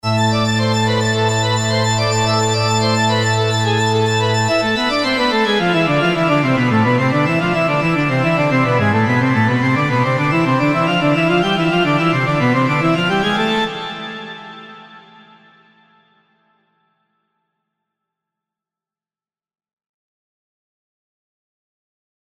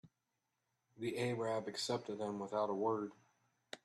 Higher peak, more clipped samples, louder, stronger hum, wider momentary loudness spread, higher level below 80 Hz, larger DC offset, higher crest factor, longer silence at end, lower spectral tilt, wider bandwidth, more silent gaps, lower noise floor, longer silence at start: first, -2 dBFS vs -24 dBFS; neither; first, -15 LUFS vs -40 LUFS; neither; second, 2 LU vs 8 LU; first, -46 dBFS vs -84 dBFS; neither; about the same, 16 dB vs 18 dB; first, 7.3 s vs 0.1 s; about the same, -5 dB/octave vs -5 dB/octave; first, 15 kHz vs 13 kHz; neither; about the same, under -90 dBFS vs -87 dBFS; about the same, 0.05 s vs 0.05 s